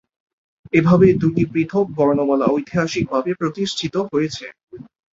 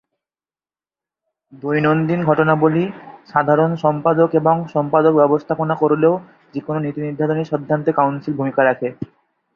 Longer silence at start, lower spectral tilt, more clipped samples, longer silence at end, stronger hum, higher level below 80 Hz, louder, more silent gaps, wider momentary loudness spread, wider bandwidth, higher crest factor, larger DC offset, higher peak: second, 0.75 s vs 1.55 s; second, -6.5 dB/octave vs -9.5 dB/octave; neither; second, 0.3 s vs 0.5 s; neither; first, -50 dBFS vs -60 dBFS; about the same, -18 LUFS vs -17 LUFS; first, 4.63-4.67 s vs none; about the same, 10 LU vs 10 LU; first, 7.8 kHz vs 6.4 kHz; about the same, 16 dB vs 16 dB; neither; about the same, -2 dBFS vs -2 dBFS